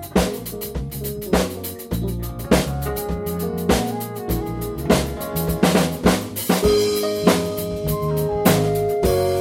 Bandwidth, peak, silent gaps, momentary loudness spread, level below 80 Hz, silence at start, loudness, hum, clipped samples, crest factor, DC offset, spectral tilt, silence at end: 17 kHz; -2 dBFS; none; 10 LU; -34 dBFS; 0 s; -21 LUFS; none; under 0.1%; 20 dB; under 0.1%; -5.5 dB/octave; 0 s